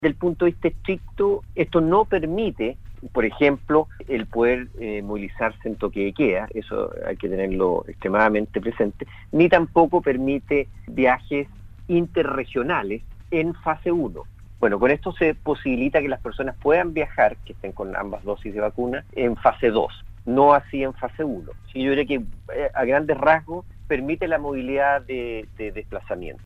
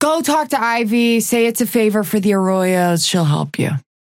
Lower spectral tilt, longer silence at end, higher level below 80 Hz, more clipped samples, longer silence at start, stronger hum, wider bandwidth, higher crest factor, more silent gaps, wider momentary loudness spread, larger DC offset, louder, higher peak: first, -8 dB/octave vs -5 dB/octave; second, 0 s vs 0.25 s; first, -42 dBFS vs -62 dBFS; neither; about the same, 0 s vs 0 s; neither; second, 6 kHz vs 17 kHz; first, 20 dB vs 12 dB; neither; first, 12 LU vs 3 LU; neither; second, -23 LUFS vs -16 LUFS; about the same, -2 dBFS vs -4 dBFS